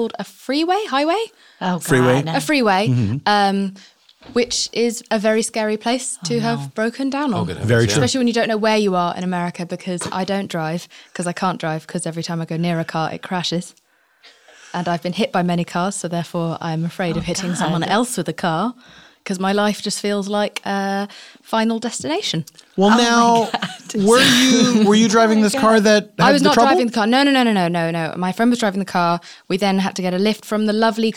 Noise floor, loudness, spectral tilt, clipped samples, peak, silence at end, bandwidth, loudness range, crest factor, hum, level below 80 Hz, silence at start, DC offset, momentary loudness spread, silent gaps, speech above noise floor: -52 dBFS; -18 LUFS; -4.5 dB/octave; under 0.1%; -2 dBFS; 0 s; 17 kHz; 9 LU; 16 dB; none; -56 dBFS; 0 s; under 0.1%; 12 LU; none; 34 dB